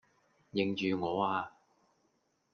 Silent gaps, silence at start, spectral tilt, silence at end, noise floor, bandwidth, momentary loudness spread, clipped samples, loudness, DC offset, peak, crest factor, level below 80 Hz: none; 0.55 s; -6.5 dB/octave; 1.05 s; -76 dBFS; 6.6 kHz; 7 LU; under 0.1%; -34 LUFS; under 0.1%; -18 dBFS; 20 dB; -78 dBFS